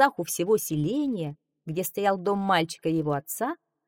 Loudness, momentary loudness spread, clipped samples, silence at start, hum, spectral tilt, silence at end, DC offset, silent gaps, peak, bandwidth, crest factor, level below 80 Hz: -27 LUFS; 9 LU; under 0.1%; 0 s; none; -5 dB/octave; 0.3 s; under 0.1%; none; -6 dBFS; 19.5 kHz; 20 dB; -62 dBFS